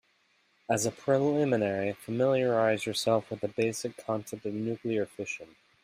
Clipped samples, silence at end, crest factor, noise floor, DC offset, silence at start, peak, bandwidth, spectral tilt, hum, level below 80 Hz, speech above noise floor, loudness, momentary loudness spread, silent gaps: under 0.1%; 0.4 s; 18 dB; -69 dBFS; under 0.1%; 0.7 s; -12 dBFS; 15.5 kHz; -5 dB/octave; none; -70 dBFS; 40 dB; -30 LUFS; 10 LU; none